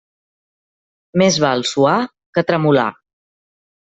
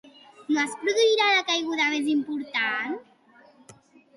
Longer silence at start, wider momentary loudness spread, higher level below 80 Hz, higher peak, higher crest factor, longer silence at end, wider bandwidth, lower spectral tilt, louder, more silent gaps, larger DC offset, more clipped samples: first, 1.15 s vs 0.4 s; about the same, 8 LU vs 10 LU; first, -58 dBFS vs -78 dBFS; first, -2 dBFS vs -10 dBFS; about the same, 18 dB vs 18 dB; first, 0.95 s vs 0.45 s; second, 8.2 kHz vs 11.5 kHz; first, -5 dB/octave vs -1.5 dB/octave; first, -16 LUFS vs -24 LUFS; first, 2.26-2.33 s vs none; neither; neither